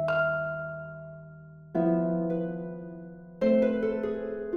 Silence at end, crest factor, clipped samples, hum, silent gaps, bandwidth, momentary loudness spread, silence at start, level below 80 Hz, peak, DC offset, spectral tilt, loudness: 0 s; 16 dB; under 0.1%; none; none; 6.4 kHz; 20 LU; 0 s; -60 dBFS; -14 dBFS; under 0.1%; -9.5 dB/octave; -29 LUFS